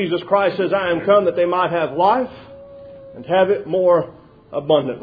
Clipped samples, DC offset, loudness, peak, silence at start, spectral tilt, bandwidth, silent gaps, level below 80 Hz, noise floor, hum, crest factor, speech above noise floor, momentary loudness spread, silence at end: under 0.1%; under 0.1%; -18 LUFS; -2 dBFS; 0 s; -9 dB/octave; 5 kHz; none; -56 dBFS; -39 dBFS; none; 16 dB; 21 dB; 13 LU; 0 s